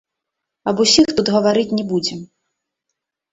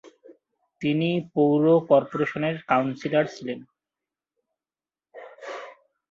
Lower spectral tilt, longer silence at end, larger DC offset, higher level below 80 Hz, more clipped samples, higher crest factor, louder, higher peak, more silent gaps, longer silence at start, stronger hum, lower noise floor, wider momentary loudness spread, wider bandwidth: second, -4 dB/octave vs -7.5 dB/octave; first, 1.1 s vs 0.4 s; neither; first, -52 dBFS vs -70 dBFS; neither; about the same, 18 dB vs 20 dB; first, -16 LUFS vs -23 LUFS; first, 0 dBFS vs -6 dBFS; neither; first, 0.65 s vs 0.3 s; neither; second, -80 dBFS vs under -90 dBFS; second, 13 LU vs 19 LU; first, 8.2 kHz vs 7.4 kHz